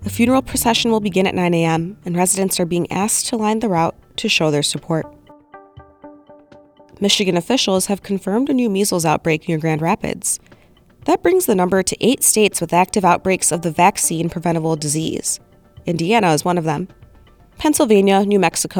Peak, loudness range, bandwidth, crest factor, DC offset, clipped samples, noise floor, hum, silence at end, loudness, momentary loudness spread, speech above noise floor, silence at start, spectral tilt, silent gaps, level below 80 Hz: 0 dBFS; 5 LU; over 20 kHz; 16 dB; under 0.1%; under 0.1%; -47 dBFS; none; 0 s; -17 LUFS; 8 LU; 30 dB; 0 s; -4 dB/octave; none; -48 dBFS